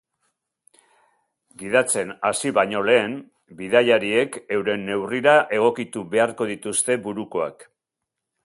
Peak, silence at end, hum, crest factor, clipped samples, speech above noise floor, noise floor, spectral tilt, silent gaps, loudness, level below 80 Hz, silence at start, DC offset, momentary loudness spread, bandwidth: -2 dBFS; 0.8 s; none; 22 dB; under 0.1%; 62 dB; -84 dBFS; -3 dB/octave; none; -21 LUFS; -66 dBFS; 1.6 s; under 0.1%; 11 LU; 11.5 kHz